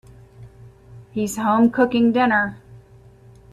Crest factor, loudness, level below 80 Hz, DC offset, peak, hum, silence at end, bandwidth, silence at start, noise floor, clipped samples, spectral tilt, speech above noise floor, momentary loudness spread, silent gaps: 18 dB; -19 LUFS; -52 dBFS; under 0.1%; -4 dBFS; none; 0.75 s; 14 kHz; 0.4 s; -47 dBFS; under 0.1%; -5.5 dB/octave; 30 dB; 11 LU; none